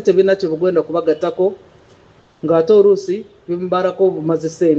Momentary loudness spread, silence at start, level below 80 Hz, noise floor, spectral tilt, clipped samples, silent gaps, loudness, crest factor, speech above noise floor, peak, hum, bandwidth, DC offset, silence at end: 13 LU; 0 s; -62 dBFS; -49 dBFS; -7 dB/octave; under 0.1%; none; -16 LUFS; 14 dB; 34 dB; -2 dBFS; none; 7.8 kHz; under 0.1%; 0 s